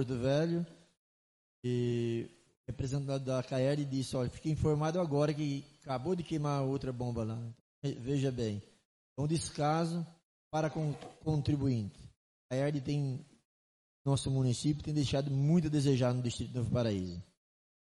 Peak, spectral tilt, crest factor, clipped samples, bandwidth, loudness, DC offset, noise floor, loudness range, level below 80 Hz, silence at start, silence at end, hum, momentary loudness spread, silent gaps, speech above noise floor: -18 dBFS; -7 dB/octave; 16 dB; under 0.1%; 11.5 kHz; -34 LUFS; under 0.1%; under -90 dBFS; 4 LU; -58 dBFS; 0 s; 0.75 s; none; 10 LU; 0.99-1.63 s, 2.57-2.64 s, 7.60-7.82 s, 8.85-9.16 s, 10.25-10.51 s, 12.16-12.49 s, 13.45-14.05 s; over 57 dB